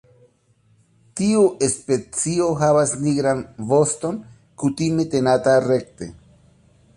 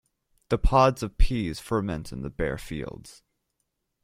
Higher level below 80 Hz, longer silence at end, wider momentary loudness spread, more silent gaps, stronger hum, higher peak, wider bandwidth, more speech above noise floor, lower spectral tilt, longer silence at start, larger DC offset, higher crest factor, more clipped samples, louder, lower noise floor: second, -54 dBFS vs -32 dBFS; about the same, 0.85 s vs 0.95 s; second, 11 LU vs 15 LU; neither; neither; about the same, -4 dBFS vs -6 dBFS; second, 11.5 kHz vs 15 kHz; second, 40 dB vs 54 dB; about the same, -5.5 dB/octave vs -6.5 dB/octave; first, 1.15 s vs 0.5 s; neither; about the same, 16 dB vs 20 dB; neither; first, -20 LUFS vs -27 LUFS; second, -60 dBFS vs -79 dBFS